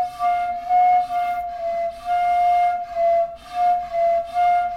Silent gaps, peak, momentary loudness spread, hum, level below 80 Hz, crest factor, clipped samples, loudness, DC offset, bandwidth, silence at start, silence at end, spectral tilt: none; -10 dBFS; 8 LU; none; -52 dBFS; 10 dB; under 0.1%; -20 LUFS; under 0.1%; 10 kHz; 0 s; 0 s; -3.5 dB/octave